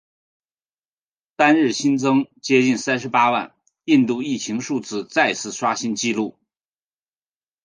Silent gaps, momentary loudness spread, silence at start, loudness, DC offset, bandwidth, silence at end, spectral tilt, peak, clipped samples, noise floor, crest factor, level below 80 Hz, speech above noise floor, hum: none; 9 LU; 1.4 s; -20 LUFS; under 0.1%; 10 kHz; 1.35 s; -4 dB/octave; 0 dBFS; under 0.1%; under -90 dBFS; 20 dB; -70 dBFS; over 71 dB; none